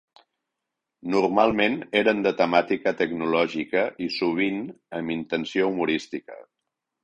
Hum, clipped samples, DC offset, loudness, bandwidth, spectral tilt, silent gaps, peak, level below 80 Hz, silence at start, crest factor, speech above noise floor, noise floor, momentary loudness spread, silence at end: none; under 0.1%; under 0.1%; -24 LUFS; 10 kHz; -6 dB/octave; none; -4 dBFS; -62 dBFS; 1.05 s; 20 dB; 60 dB; -84 dBFS; 11 LU; 0.6 s